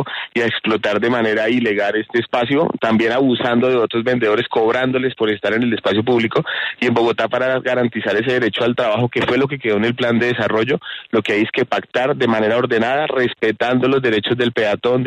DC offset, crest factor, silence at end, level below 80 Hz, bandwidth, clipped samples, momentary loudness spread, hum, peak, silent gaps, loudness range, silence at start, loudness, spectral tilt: under 0.1%; 14 dB; 0 s; -56 dBFS; 9.2 kHz; under 0.1%; 3 LU; none; -4 dBFS; none; 1 LU; 0 s; -17 LUFS; -6.5 dB/octave